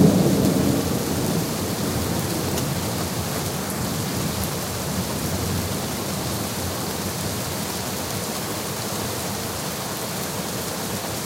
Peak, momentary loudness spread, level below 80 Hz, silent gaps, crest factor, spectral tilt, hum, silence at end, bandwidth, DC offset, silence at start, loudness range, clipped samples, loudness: -2 dBFS; 5 LU; -44 dBFS; none; 22 dB; -4.5 dB/octave; none; 0 s; 16 kHz; under 0.1%; 0 s; 3 LU; under 0.1%; -24 LUFS